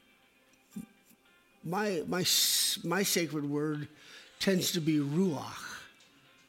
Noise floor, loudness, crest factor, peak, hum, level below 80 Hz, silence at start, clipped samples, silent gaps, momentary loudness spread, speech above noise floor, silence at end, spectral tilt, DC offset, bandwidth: -65 dBFS; -30 LUFS; 18 dB; -16 dBFS; none; -74 dBFS; 0.75 s; under 0.1%; none; 22 LU; 34 dB; 0.6 s; -3.5 dB/octave; under 0.1%; 16.5 kHz